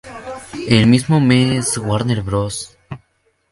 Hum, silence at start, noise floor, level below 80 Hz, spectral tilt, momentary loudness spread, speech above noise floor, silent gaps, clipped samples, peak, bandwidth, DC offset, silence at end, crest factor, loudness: none; 0.05 s; -63 dBFS; -42 dBFS; -5.5 dB/octave; 20 LU; 48 dB; none; under 0.1%; 0 dBFS; 11.5 kHz; under 0.1%; 0.55 s; 16 dB; -15 LUFS